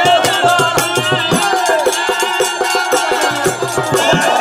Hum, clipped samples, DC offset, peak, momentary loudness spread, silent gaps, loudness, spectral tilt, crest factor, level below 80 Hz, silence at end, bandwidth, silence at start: none; under 0.1%; under 0.1%; 0 dBFS; 4 LU; none; -13 LUFS; -2.5 dB/octave; 14 dB; -50 dBFS; 0 s; 16 kHz; 0 s